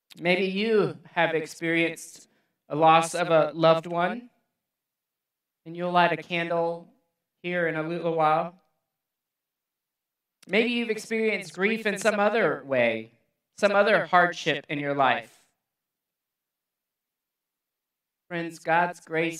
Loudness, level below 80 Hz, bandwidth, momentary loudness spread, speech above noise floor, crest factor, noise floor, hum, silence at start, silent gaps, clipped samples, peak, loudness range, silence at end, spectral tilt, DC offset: -25 LUFS; -82 dBFS; 14 kHz; 12 LU; 62 dB; 22 dB; -87 dBFS; none; 0.15 s; none; under 0.1%; -6 dBFS; 7 LU; 0 s; -5 dB/octave; under 0.1%